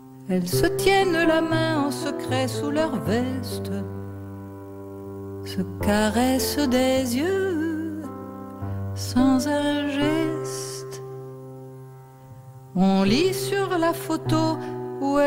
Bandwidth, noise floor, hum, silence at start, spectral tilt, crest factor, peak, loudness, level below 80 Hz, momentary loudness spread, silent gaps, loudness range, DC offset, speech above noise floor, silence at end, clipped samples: 16 kHz; -44 dBFS; none; 0 s; -5.5 dB/octave; 18 dB; -6 dBFS; -23 LUFS; -48 dBFS; 18 LU; none; 5 LU; under 0.1%; 22 dB; 0 s; under 0.1%